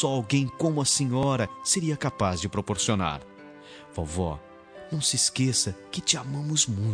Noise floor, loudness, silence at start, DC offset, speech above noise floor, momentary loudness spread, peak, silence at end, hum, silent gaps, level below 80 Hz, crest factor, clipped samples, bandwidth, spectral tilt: -46 dBFS; -26 LUFS; 0 s; under 0.1%; 20 dB; 13 LU; -6 dBFS; 0 s; none; none; -50 dBFS; 22 dB; under 0.1%; 10.5 kHz; -3.5 dB/octave